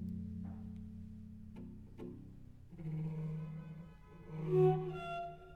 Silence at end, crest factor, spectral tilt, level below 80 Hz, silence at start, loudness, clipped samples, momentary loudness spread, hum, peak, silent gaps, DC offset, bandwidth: 0 s; 20 dB; -9.5 dB/octave; -62 dBFS; 0 s; -40 LUFS; under 0.1%; 22 LU; none; -20 dBFS; none; under 0.1%; 4.9 kHz